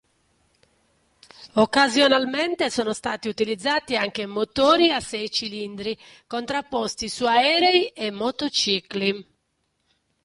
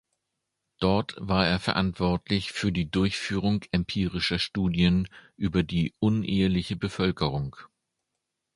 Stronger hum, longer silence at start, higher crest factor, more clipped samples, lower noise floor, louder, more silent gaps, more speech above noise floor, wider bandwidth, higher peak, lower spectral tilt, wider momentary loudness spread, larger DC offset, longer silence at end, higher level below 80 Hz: neither; first, 1.4 s vs 0.8 s; about the same, 18 dB vs 20 dB; neither; second, -73 dBFS vs -83 dBFS; first, -22 LUFS vs -27 LUFS; neither; second, 50 dB vs 57 dB; about the same, 11.5 kHz vs 11.5 kHz; about the same, -6 dBFS vs -6 dBFS; second, -3 dB/octave vs -6.5 dB/octave; first, 13 LU vs 5 LU; neither; first, 1.05 s vs 0.9 s; second, -58 dBFS vs -44 dBFS